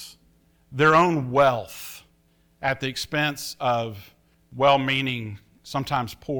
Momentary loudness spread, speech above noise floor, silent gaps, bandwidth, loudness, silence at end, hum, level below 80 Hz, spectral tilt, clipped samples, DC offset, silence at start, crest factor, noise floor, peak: 20 LU; 39 dB; none; over 20 kHz; -23 LUFS; 0 s; none; -56 dBFS; -5 dB/octave; under 0.1%; under 0.1%; 0 s; 18 dB; -62 dBFS; -6 dBFS